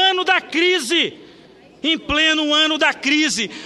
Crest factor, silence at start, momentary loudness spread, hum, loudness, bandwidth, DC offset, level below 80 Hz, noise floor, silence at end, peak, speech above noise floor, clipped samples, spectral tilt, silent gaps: 16 dB; 0 s; 6 LU; none; -16 LUFS; 13 kHz; under 0.1%; -48 dBFS; -46 dBFS; 0 s; -2 dBFS; 28 dB; under 0.1%; -1.5 dB/octave; none